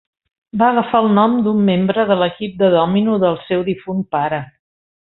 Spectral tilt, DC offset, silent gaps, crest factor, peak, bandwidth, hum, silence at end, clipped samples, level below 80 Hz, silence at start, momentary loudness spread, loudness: -11.5 dB/octave; under 0.1%; none; 14 dB; -2 dBFS; 4.1 kHz; none; 0.6 s; under 0.1%; -54 dBFS; 0.55 s; 8 LU; -16 LUFS